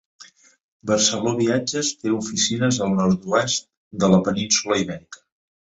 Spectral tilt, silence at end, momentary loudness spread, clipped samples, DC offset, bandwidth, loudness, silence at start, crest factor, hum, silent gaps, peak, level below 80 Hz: -4 dB/octave; 0.55 s; 7 LU; under 0.1%; under 0.1%; 8 kHz; -20 LUFS; 0.2 s; 18 dB; none; 0.64-0.80 s, 3.77-3.91 s; -4 dBFS; -54 dBFS